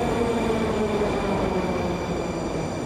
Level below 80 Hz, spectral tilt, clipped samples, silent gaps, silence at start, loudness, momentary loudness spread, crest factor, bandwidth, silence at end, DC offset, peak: -40 dBFS; -6 dB/octave; under 0.1%; none; 0 s; -25 LUFS; 4 LU; 12 dB; 15 kHz; 0 s; under 0.1%; -12 dBFS